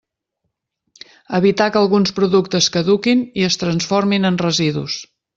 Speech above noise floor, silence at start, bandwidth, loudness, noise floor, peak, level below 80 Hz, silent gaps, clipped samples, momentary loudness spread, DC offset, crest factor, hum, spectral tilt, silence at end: 59 dB; 1.3 s; 7.8 kHz; -16 LUFS; -75 dBFS; -2 dBFS; -54 dBFS; none; under 0.1%; 5 LU; under 0.1%; 16 dB; none; -4.5 dB/octave; 0.35 s